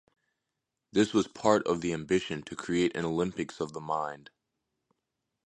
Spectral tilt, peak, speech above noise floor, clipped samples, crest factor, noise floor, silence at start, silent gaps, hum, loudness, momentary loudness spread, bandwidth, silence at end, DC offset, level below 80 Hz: -5.5 dB/octave; -10 dBFS; 56 dB; under 0.1%; 22 dB; -86 dBFS; 0.95 s; none; none; -30 LUFS; 11 LU; 11 kHz; 1.25 s; under 0.1%; -62 dBFS